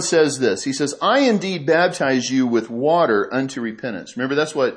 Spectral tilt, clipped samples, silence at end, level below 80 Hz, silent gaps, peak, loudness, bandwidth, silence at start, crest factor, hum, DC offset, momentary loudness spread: -4 dB/octave; under 0.1%; 0 s; -68 dBFS; none; -4 dBFS; -19 LUFS; 11 kHz; 0 s; 16 dB; none; under 0.1%; 9 LU